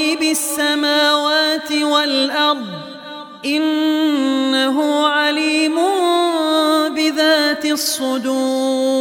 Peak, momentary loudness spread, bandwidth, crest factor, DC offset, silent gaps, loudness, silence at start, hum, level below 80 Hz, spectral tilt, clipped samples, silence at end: -2 dBFS; 5 LU; 18 kHz; 16 dB; under 0.1%; none; -16 LUFS; 0 s; none; -70 dBFS; -1.5 dB/octave; under 0.1%; 0 s